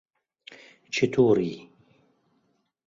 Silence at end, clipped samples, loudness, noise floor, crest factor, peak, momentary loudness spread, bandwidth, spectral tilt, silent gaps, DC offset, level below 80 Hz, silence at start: 1.25 s; under 0.1%; -24 LUFS; -71 dBFS; 20 dB; -8 dBFS; 26 LU; 7.6 kHz; -6 dB/octave; none; under 0.1%; -64 dBFS; 0.5 s